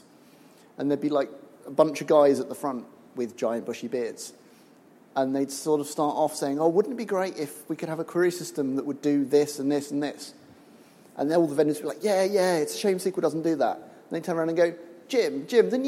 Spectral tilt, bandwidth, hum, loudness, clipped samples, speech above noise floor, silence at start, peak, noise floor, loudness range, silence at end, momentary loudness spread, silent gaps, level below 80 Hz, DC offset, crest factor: -5 dB/octave; 16 kHz; none; -26 LUFS; under 0.1%; 29 dB; 0.8 s; -6 dBFS; -55 dBFS; 4 LU; 0 s; 12 LU; none; -80 dBFS; under 0.1%; 20 dB